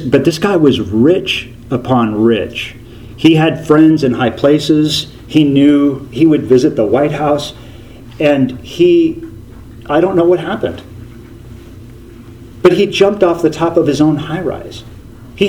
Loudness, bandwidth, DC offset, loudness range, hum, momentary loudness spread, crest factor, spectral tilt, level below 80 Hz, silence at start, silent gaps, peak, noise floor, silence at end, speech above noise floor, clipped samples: -12 LUFS; 15 kHz; under 0.1%; 5 LU; none; 12 LU; 12 dB; -6.5 dB/octave; -40 dBFS; 0 s; none; 0 dBFS; -34 dBFS; 0 s; 22 dB; 0.1%